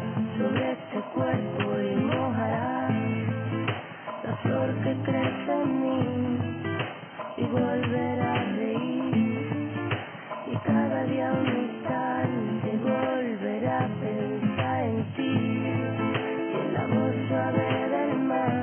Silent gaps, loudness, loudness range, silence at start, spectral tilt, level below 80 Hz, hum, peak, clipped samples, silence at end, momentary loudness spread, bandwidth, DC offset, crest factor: none; -28 LUFS; 1 LU; 0 s; -11.5 dB/octave; -76 dBFS; none; -12 dBFS; under 0.1%; 0 s; 5 LU; 3.4 kHz; under 0.1%; 14 dB